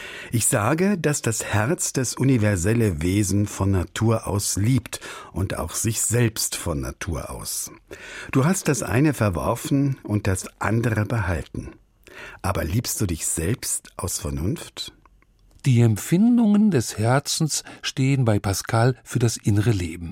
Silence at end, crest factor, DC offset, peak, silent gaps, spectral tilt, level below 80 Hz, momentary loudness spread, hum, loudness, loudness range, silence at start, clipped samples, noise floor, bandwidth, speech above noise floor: 0 s; 18 dB; under 0.1%; -6 dBFS; none; -5 dB/octave; -42 dBFS; 10 LU; none; -22 LUFS; 5 LU; 0 s; under 0.1%; -56 dBFS; 16.5 kHz; 34 dB